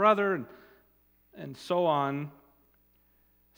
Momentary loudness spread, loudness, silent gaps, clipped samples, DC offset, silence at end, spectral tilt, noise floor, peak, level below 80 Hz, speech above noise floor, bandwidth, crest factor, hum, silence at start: 19 LU; -29 LUFS; none; under 0.1%; under 0.1%; 1.25 s; -6.5 dB/octave; -66 dBFS; -8 dBFS; -74 dBFS; 38 dB; 16.5 kHz; 22 dB; 60 Hz at -65 dBFS; 0 s